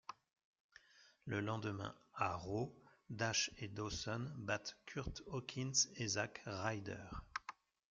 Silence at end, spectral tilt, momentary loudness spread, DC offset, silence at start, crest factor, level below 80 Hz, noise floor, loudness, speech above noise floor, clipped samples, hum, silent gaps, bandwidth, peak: 0.4 s; -3 dB/octave; 12 LU; under 0.1%; 0.1 s; 22 dB; -64 dBFS; -70 dBFS; -42 LUFS; 26 dB; under 0.1%; none; 0.44-0.53 s, 0.60-0.69 s; 10.5 kHz; -22 dBFS